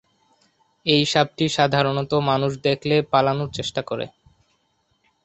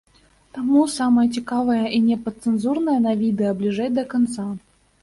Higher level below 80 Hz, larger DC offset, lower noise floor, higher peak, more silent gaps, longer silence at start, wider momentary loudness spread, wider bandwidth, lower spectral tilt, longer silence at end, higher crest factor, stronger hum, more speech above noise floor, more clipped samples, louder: about the same, -56 dBFS vs -58 dBFS; neither; first, -68 dBFS vs -56 dBFS; first, -2 dBFS vs -6 dBFS; neither; first, 0.85 s vs 0.55 s; about the same, 9 LU vs 9 LU; second, 8.2 kHz vs 11.5 kHz; about the same, -5 dB/octave vs -6 dB/octave; first, 1.15 s vs 0.45 s; first, 22 dB vs 14 dB; neither; first, 47 dB vs 37 dB; neither; about the same, -21 LUFS vs -21 LUFS